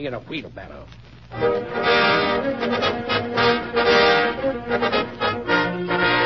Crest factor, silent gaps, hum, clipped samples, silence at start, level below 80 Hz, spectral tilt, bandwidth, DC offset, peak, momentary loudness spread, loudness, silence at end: 16 dB; none; none; under 0.1%; 0 s; -48 dBFS; -5.5 dB/octave; 6.2 kHz; 0.2%; -4 dBFS; 15 LU; -20 LUFS; 0 s